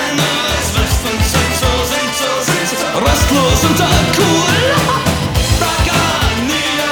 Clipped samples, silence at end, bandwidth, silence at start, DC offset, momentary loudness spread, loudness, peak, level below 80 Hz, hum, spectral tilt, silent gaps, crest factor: under 0.1%; 0 s; over 20 kHz; 0 s; under 0.1%; 4 LU; -13 LUFS; 0 dBFS; -24 dBFS; none; -3.5 dB/octave; none; 12 dB